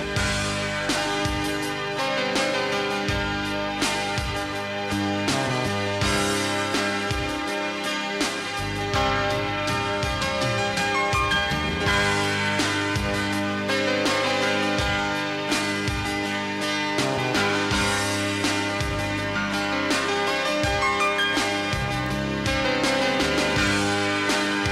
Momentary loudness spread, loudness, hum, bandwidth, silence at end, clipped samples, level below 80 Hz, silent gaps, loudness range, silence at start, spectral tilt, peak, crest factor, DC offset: 5 LU; -23 LUFS; none; 16 kHz; 0 s; under 0.1%; -40 dBFS; none; 2 LU; 0 s; -3.5 dB/octave; -12 dBFS; 12 dB; under 0.1%